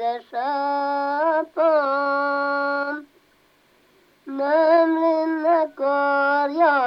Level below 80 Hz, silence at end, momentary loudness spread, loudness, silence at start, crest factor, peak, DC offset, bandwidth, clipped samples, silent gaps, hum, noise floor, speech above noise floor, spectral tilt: -76 dBFS; 0 s; 9 LU; -21 LUFS; 0 s; 14 dB; -6 dBFS; under 0.1%; 5.8 kHz; under 0.1%; none; none; -59 dBFS; 37 dB; -5 dB/octave